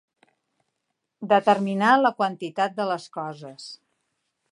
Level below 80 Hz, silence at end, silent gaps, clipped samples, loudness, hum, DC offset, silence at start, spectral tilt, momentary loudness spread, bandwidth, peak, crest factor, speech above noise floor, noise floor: -78 dBFS; 0.75 s; none; under 0.1%; -23 LUFS; none; under 0.1%; 1.2 s; -5.5 dB/octave; 20 LU; 11 kHz; -4 dBFS; 20 dB; 57 dB; -80 dBFS